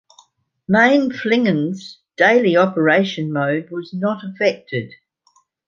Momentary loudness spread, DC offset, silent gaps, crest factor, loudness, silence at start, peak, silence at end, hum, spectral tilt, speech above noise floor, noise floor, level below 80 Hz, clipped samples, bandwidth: 14 LU; under 0.1%; none; 16 dB; -17 LUFS; 0.7 s; -2 dBFS; 0.75 s; none; -6.5 dB/octave; 43 dB; -60 dBFS; -64 dBFS; under 0.1%; 7.4 kHz